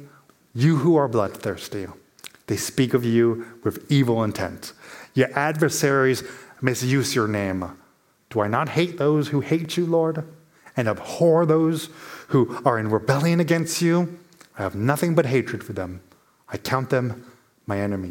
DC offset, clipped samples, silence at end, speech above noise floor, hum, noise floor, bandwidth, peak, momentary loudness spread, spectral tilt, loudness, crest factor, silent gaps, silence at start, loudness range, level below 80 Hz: under 0.1%; under 0.1%; 0 s; 38 dB; none; -60 dBFS; 17 kHz; -2 dBFS; 16 LU; -6 dB/octave; -22 LUFS; 20 dB; none; 0 s; 3 LU; -62 dBFS